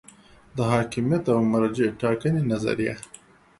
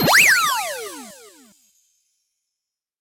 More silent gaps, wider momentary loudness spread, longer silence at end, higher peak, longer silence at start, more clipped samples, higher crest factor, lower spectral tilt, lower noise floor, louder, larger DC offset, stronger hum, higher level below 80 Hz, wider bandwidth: neither; second, 9 LU vs 22 LU; second, 0.6 s vs 1.9 s; about the same, -6 dBFS vs -4 dBFS; first, 0.55 s vs 0 s; neither; about the same, 18 dB vs 18 dB; first, -7 dB/octave vs -1.5 dB/octave; second, -51 dBFS vs -85 dBFS; second, -24 LUFS vs -15 LUFS; neither; neither; about the same, -54 dBFS vs -58 dBFS; second, 11.5 kHz vs 16 kHz